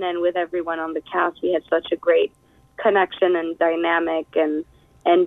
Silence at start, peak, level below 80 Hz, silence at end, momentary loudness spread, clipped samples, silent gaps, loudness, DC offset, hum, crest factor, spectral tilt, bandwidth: 0 s; -6 dBFS; -62 dBFS; 0 s; 7 LU; under 0.1%; none; -22 LUFS; under 0.1%; none; 16 dB; -6.5 dB/octave; 4 kHz